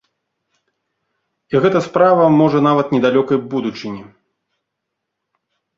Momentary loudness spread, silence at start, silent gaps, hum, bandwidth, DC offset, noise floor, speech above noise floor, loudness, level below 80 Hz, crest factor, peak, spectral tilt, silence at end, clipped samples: 14 LU; 1.5 s; none; none; 7.6 kHz; under 0.1%; -78 dBFS; 63 dB; -15 LUFS; -58 dBFS; 16 dB; -2 dBFS; -7.5 dB/octave; 1.75 s; under 0.1%